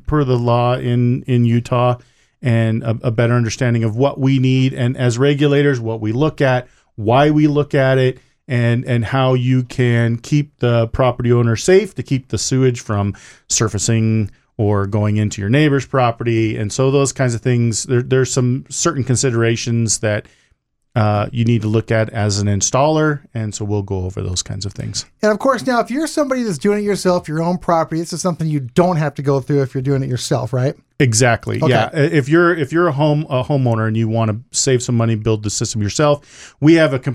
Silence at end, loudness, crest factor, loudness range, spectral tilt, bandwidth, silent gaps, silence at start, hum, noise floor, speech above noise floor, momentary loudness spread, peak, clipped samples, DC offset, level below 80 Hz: 0 s; -16 LUFS; 16 dB; 3 LU; -5.5 dB/octave; 12.5 kHz; none; 0.05 s; none; -62 dBFS; 46 dB; 7 LU; 0 dBFS; under 0.1%; under 0.1%; -44 dBFS